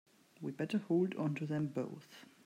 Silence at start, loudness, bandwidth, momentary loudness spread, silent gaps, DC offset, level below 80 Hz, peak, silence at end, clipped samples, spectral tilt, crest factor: 0.4 s; -38 LUFS; 15 kHz; 14 LU; none; under 0.1%; -82 dBFS; -24 dBFS; 0.2 s; under 0.1%; -8 dB/octave; 14 dB